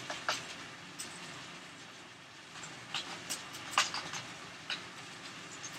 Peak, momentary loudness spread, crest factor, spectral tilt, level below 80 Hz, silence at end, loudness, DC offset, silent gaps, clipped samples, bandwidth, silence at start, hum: -14 dBFS; 15 LU; 28 dB; -1 dB/octave; -78 dBFS; 0 s; -40 LUFS; under 0.1%; none; under 0.1%; 16 kHz; 0 s; none